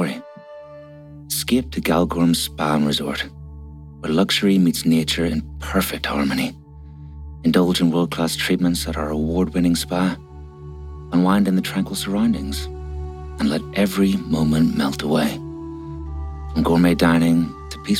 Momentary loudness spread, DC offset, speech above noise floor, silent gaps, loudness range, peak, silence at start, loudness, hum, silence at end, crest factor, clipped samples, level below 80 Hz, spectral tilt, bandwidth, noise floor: 21 LU; under 0.1%; 21 dB; none; 2 LU; -4 dBFS; 0 s; -20 LUFS; none; 0 s; 16 dB; under 0.1%; -38 dBFS; -5.5 dB/octave; 17 kHz; -40 dBFS